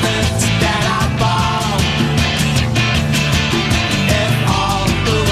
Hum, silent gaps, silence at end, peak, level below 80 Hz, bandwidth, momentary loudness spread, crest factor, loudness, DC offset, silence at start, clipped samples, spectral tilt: none; none; 0 s; -2 dBFS; -28 dBFS; 15 kHz; 1 LU; 12 dB; -15 LUFS; under 0.1%; 0 s; under 0.1%; -4.5 dB/octave